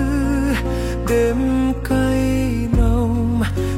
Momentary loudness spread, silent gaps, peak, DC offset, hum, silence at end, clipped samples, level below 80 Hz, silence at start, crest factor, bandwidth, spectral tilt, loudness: 3 LU; none; -4 dBFS; under 0.1%; none; 0 s; under 0.1%; -24 dBFS; 0 s; 14 dB; 16 kHz; -7 dB/octave; -19 LUFS